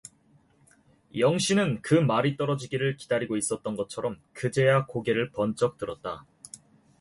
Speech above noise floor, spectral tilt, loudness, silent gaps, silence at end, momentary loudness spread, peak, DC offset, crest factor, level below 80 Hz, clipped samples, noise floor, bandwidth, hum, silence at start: 36 dB; -5.5 dB/octave; -27 LUFS; none; 0.45 s; 15 LU; -10 dBFS; under 0.1%; 18 dB; -62 dBFS; under 0.1%; -62 dBFS; 11.5 kHz; none; 1.15 s